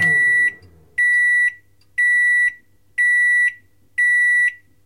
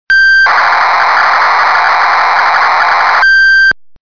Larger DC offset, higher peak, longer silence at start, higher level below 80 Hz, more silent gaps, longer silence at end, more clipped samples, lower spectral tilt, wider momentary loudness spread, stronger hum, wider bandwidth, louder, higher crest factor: second, 0.2% vs 2%; second, -8 dBFS vs -2 dBFS; about the same, 0 s vs 0.1 s; second, -64 dBFS vs -44 dBFS; neither; about the same, 0.3 s vs 0.3 s; neither; about the same, -1.5 dB/octave vs -0.5 dB/octave; first, 7 LU vs 4 LU; neither; first, 12.5 kHz vs 5.4 kHz; second, -15 LUFS vs -6 LUFS; first, 10 dB vs 4 dB